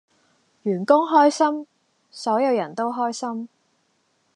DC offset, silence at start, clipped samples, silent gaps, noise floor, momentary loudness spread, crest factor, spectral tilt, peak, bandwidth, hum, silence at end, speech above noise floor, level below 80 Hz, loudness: under 0.1%; 0.65 s; under 0.1%; none; -67 dBFS; 15 LU; 20 dB; -5 dB/octave; -2 dBFS; 10.5 kHz; none; 0.9 s; 47 dB; -88 dBFS; -21 LUFS